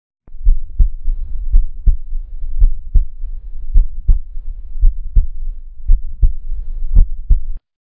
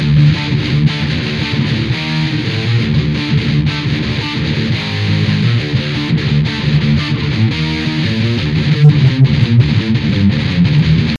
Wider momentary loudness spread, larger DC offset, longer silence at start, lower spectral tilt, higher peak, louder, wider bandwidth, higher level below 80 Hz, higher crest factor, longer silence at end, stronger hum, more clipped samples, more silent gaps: first, 14 LU vs 6 LU; neither; first, 0.3 s vs 0 s; first, -13 dB/octave vs -7 dB/octave; about the same, 0 dBFS vs 0 dBFS; second, -21 LUFS vs -14 LUFS; second, 0.6 kHz vs 7.4 kHz; first, -16 dBFS vs -30 dBFS; about the same, 12 dB vs 12 dB; first, 0.3 s vs 0 s; neither; first, 0.2% vs under 0.1%; neither